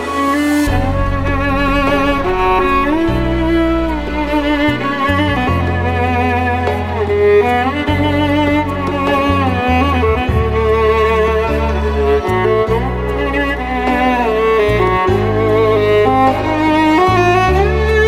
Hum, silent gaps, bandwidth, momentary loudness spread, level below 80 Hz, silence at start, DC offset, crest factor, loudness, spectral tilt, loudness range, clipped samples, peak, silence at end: none; none; 16 kHz; 5 LU; -24 dBFS; 0 s; under 0.1%; 12 dB; -14 LUFS; -7 dB/octave; 3 LU; under 0.1%; 0 dBFS; 0 s